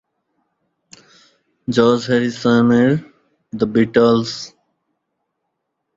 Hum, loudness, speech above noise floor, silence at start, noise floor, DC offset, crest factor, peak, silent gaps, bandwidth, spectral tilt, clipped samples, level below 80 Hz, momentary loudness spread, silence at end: none; -16 LUFS; 60 dB; 1.7 s; -75 dBFS; under 0.1%; 18 dB; -2 dBFS; none; 7.8 kHz; -6.5 dB/octave; under 0.1%; -56 dBFS; 16 LU; 1.5 s